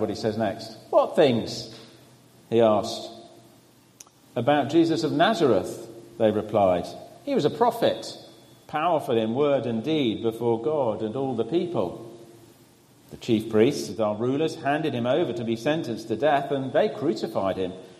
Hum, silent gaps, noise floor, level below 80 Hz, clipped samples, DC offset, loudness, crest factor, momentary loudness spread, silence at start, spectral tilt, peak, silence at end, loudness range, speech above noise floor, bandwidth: none; none; -55 dBFS; -64 dBFS; under 0.1%; under 0.1%; -25 LUFS; 18 dB; 13 LU; 0 s; -6 dB/octave; -6 dBFS; 0.05 s; 4 LU; 31 dB; 15 kHz